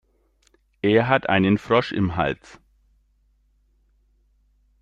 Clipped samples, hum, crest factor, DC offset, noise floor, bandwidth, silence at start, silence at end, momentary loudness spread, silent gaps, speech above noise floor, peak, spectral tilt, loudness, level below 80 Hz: under 0.1%; none; 22 dB; under 0.1%; -63 dBFS; 7.8 kHz; 0.85 s; 2.45 s; 8 LU; none; 43 dB; -2 dBFS; -7.5 dB/octave; -21 LUFS; -52 dBFS